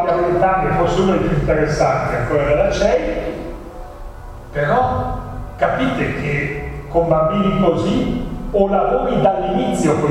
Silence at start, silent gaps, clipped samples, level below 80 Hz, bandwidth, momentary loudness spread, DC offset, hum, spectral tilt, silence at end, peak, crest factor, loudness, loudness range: 0 s; none; under 0.1%; -30 dBFS; 14 kHz; 13 LU; under 0.1%; none; -6.5 dB/octave; 0 s; -2 dBFS; 16 dB; -17 LUFS; 4 LU